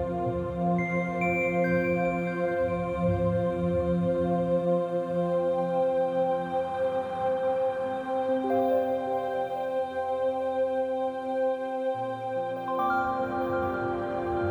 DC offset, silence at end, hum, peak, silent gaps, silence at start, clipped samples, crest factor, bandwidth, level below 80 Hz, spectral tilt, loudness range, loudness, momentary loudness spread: under 0.1%; 0 s; none; -14 dBFS; none; 0 s; under 0.1%; 12 dB; over 20 kHz; -54 dBFS; -8.5 dB/octave; 3 LU; -28 LUFS; 5 LU